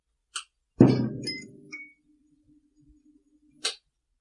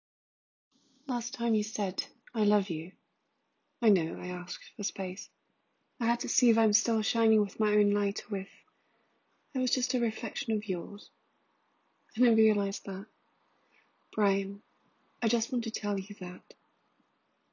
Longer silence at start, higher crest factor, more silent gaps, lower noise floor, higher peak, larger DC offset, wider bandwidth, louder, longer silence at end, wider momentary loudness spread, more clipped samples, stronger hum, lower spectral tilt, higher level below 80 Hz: second, 0.35 s vs 1.1 s; first, 28 dB vs 20 dB; neither; second, -65 dBFS vs -78 dBFS; first, -2 dBFS vs -12 dBFS; neither; first, 11.5 kHz vs 7.6 kHz; first, -27 LUFS vs -30 LUFS; second, 0.45 s vs 1.15 s; first, 22 LU vs 15 LU; neither; neither; first, -6 dB/octave vs -4 dB/octave; first, -58 dBFS vs -82 dBFS